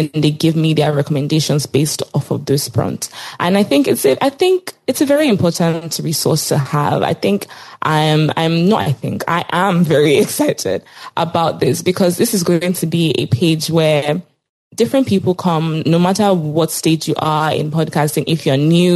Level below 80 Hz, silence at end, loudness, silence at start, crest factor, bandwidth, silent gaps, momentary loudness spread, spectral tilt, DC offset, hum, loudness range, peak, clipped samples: -56 dBFS; 0 s; -15 LUFS; 0 s; 12 dB; 15 kHz; 14.49-14.71 s; 7 LU; -5.5 dB/octave; under 0.1%; none; 1 LU; -2 dBFS; under 0.1%